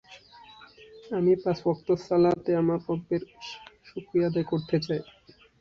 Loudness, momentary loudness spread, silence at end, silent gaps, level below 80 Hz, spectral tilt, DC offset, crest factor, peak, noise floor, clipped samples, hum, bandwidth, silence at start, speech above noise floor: -27 LUFS; 18 LU; 0.6 s; none; -62 dBFS; -8 dB/octave; under 0.1%; 16 dB; -12 dBFS; -51 dBFS; under 0.1%; none; 7 kHz; 0.1 s; 25 dB